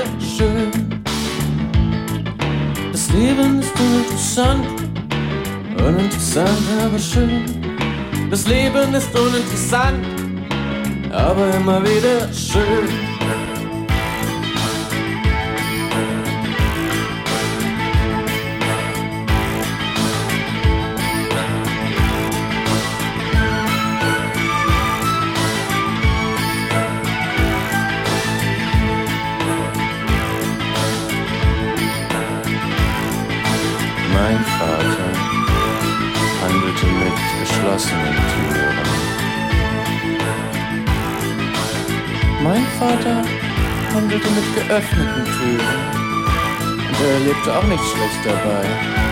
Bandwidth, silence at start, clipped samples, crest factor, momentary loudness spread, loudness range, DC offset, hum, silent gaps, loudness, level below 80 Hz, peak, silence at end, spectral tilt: 16.5 kHz; 0 s; under 0.1%; 14 dB; 5 LU; 2 LU; under 0.1%; none; none; -18 LUFS; -28 dBFS; -4 dBFS; 0 s; -5 dB/octave